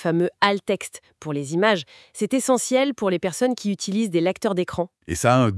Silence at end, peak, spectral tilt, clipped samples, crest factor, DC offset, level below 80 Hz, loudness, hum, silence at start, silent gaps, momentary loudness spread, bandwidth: 0 s; -2 dBFS; -5 dB/octave; under 0.1%; 20 dB; under 0.1%; -56 dBFS; -22 LUFS; none; 0 s; none; 10 LU; 12 kHz